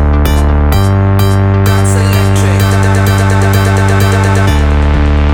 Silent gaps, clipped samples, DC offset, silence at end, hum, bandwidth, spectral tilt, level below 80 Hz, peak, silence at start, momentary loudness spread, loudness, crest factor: none; under 0.1%; 0.5%; 0 s; none; 17 kHz; -6 dB/octave; -14 dBFS; 0 dBFS; 0 s; 1 LU; -9 LUFS; 8 dB